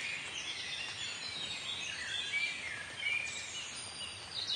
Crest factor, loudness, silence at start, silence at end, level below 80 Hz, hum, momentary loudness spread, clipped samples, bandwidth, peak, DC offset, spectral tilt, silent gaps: 16 dB; -37 LUFS; 0 s; 0 s; -72 dBFS; none; 7 LU; under 0.1%; 11.5 kHz; -24 dBFS; under 0.1%; 0 dB/octave; none